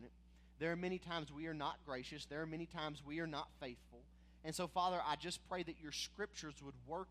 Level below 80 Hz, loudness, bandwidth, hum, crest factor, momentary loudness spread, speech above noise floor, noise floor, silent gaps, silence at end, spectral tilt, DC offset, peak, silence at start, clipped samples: -66 dBFS; -45 LUFS; 15 kHz; none; 20 dB; 13 LU; 20 dB; -65 dBFS; none; 0 s; -4 dB/octave; under 0.1%; -26 dBFS; 0 s; under 0.1%